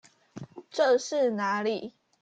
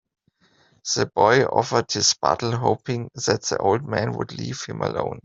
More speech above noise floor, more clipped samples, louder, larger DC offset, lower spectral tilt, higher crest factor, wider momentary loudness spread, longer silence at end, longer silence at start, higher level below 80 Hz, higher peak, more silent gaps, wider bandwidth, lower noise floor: second, 20 dB vs 39 dB; neither; second, -27 LUFS vs -22 LUFS; neither; about the same, -4 dB/octave vs -3.5 dB/octave; about the same, 16 dB vs 20 dB; first, 21 LU vs 12 LU; first, 0.35 s vs 0.05 s; second, 0.35 s vs 0.85 s; second, -76 dBFS vs -58 dBFS; second, -14 dBFS vs -2 dBFS; neither; first, 9 kHz vs 7.8 kHz; second, -46 dBFS vs -61 dBFS